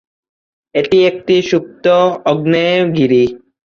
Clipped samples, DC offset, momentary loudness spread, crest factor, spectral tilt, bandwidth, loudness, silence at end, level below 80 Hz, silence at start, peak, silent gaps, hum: under 0.1%; under 0.1%; 6 LU; 12 dB; -6.5 dB/octave; 7 kHz; -13 LUFS; 0.4 s; -52 dBFS; 0.75 s; -2 dBFS; none; none